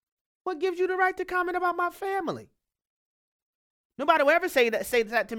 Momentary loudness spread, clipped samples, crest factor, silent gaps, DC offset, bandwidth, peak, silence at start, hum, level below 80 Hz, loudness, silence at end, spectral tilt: 11 LU; under 0.1%; 22 dB; 2.87-3.90 s; under 0.1%; 18 kHz; -6 dBFS; 0.45 s; none; -64 dBFS; -26 LUFS; 0 s; -3.5 dB/octave